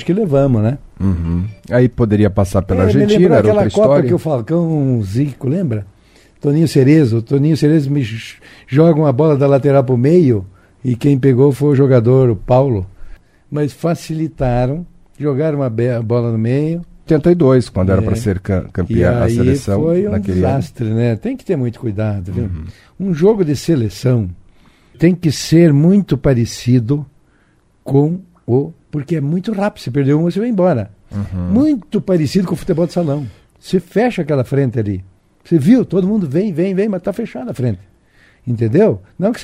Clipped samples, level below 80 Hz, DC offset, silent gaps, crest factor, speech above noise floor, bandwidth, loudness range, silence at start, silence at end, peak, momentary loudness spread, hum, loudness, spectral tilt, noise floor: under 0.1%; -38 dBFS; under 0.1%; none; 14 dB; 40 dB; 14.5 kHz; 5 LU; 0 s; 0 s; 0 dBFS; 11 LU; none; -15 LUFS; -8 dB/octave; -54 dBFS